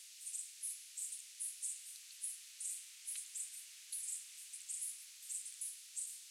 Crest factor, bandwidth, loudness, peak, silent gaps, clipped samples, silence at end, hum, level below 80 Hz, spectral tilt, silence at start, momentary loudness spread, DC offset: 20 dB; 16.5 kHz; -44 LUFS; -28 dBFS; none; under 0.1%; 0 s; none; under -90 dBFS; 9.5 dB/octave; 0 s; 4 LU; under 0.1%